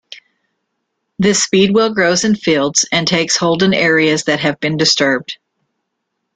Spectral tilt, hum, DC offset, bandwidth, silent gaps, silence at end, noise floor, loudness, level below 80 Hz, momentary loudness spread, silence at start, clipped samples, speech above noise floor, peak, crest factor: -3.5 dB/octave; none; under 0.1%; 9.6 kHz; none; 1 s; -73 dBFS; -13 LUFS; -52 dBFS; 5 LU; 0.1 s; under 0.1%; 59 dB; 0 dBFS; 16 dB